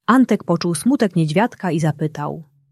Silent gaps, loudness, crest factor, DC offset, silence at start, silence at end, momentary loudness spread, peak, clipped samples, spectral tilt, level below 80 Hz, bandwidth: none; -19 LUFS; 16 dB; under 0.1%; 0.1 s; 0.3 s; 11 LU; -2 dBFS; under 0.1%; -6.5 dB/octave; -60 dBFS; 13.5 kHz